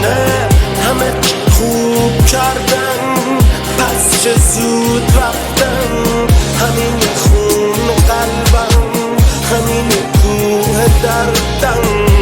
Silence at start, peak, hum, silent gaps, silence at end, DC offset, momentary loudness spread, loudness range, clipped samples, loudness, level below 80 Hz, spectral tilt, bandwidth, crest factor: 0 s; 0 dBFS; none; none; 0 s; under 0.1%; 3 LU; 1 LU; under 0.1%; -11 LUFS; -16 dBFS; -4.5 dB/octave; over 20 kHz; 10 dB